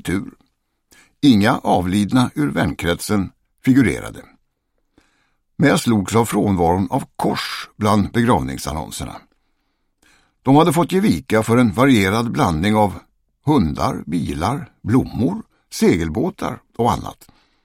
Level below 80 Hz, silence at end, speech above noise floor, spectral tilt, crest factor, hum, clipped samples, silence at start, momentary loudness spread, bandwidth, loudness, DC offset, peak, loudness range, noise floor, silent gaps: -40 dBFS; 0.55 s; 51 dB; -6 dB/octave; 16 dB; none; under 0.1%; 0.05 s; 13 LU; 16.5 kHz; -18 LUFS; under 0.1%; -2 dBFS; 4 LU; -68 dBFS; none